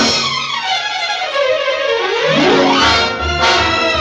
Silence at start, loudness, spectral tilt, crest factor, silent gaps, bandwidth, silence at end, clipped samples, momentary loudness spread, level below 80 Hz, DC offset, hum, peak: 0 s; -13 LUFS; -3 dB/octave; 14 dB; none; 11.5 kHz; 0 s; under 0.1%; 6 LU; -34 dBFS; under 0.1%; none; 0 dBFS